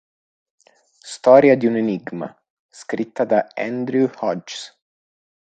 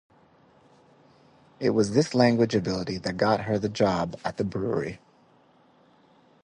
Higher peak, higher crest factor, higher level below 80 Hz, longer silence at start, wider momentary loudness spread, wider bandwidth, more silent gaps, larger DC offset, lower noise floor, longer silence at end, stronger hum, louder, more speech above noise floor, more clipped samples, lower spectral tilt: first, 0 dBFS vs -6 dBFS; about the same, 20 dB vs 22 dB; second, -68 dBFS vs -56 dBFS; second, 1.05 s vs 1.6 s; first, 21 LU vs 10 LU; second, 9.2 kHz vs 10.5 kHz; first, 2.50-2.69 s vs none; neither; second, -50 dBFS vs -60 dBFS; second, 0.9 s vs 1.45 s; neither; first, -18 LUFS vs -26 LUFS; about the same, 32 dB vs 35 dB; neither; about the same, -6 dB/octave vs -6 dB/octave